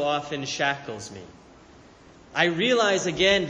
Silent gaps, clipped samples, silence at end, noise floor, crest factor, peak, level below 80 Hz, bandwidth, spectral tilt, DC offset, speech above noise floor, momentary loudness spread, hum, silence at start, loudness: none; under 0.1%; 0 s; -51 dBFS; 20 dB; -6 dBFS; -56 dBFS; 10.5 kHz; -3.5 dB/octave; under 0.1%; 26 dB; 17 LU; none; 0 s; -24 LUFS